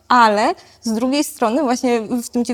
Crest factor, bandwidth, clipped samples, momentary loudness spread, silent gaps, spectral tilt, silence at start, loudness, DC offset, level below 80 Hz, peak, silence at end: 16 dB; 18.5 kHz; under 0.1%; 9 LU; none; -3.5 dB/octave; 0.1 s; -18 LUFS; under 0.1%; -56 dBFS; 0 dBFS; 0 s